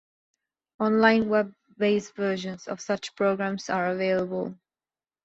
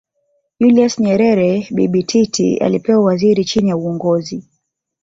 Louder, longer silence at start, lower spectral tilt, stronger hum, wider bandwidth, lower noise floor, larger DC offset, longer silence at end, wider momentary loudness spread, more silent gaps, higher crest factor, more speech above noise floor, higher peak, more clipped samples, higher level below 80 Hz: second, -26 LUFS vs -14 LUFS; first, 0.8 s vs 0.6 s; about the same, -5.5 dB/octave vs -6 dB/octave; neither; about the same, 8 kHz vs 7.8 kHz; first, under -90 dBFS vs -70 dBFS; neither; about the same, 0.7 s vs 0.6 s; first, 13 LU vs 5 LU; neither; first, 22 dB vs 12 dB; first, over 65 dB vs 56 dB; second, -6 dBFS vs -2 dBFS; neither; second, -66 dBFS vs -52 dBFS